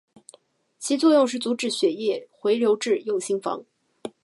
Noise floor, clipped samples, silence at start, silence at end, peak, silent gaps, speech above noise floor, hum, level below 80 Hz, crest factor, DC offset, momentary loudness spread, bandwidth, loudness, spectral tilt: -58 dBFS; under 0.1%; 0.8 s; 0.15 s; -8 dBFS; none; 35 dB; none; -80 dBFS; 16 dB; under 0.1%; 15 LU; 11.5 kHz; -23 LUFS; -3.5 dB/octave